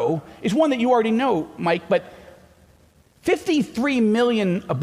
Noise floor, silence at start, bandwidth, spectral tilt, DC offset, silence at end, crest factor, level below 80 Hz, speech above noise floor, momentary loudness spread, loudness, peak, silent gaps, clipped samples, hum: -55 dBFS; 0 s; 14.5 kHz; -6 dB/octave; under 0.1%; 0 s; 14 dB; -58 dBFS; 35 dB; 6 LU; -21 LUFS; -6 dBFS; none; under 0.1%; none